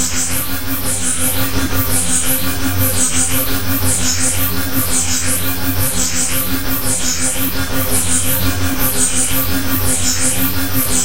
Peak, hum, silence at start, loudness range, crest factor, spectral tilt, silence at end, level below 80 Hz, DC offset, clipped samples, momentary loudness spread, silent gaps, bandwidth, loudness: 0 dBFS; none; 0 s; 1 LU; 16 dB; -2.5 dB/octave; 0 s; -30 dBFS; 10%; under 0.1%; 4 LU; none; 16.5 kHz; -15 LUFS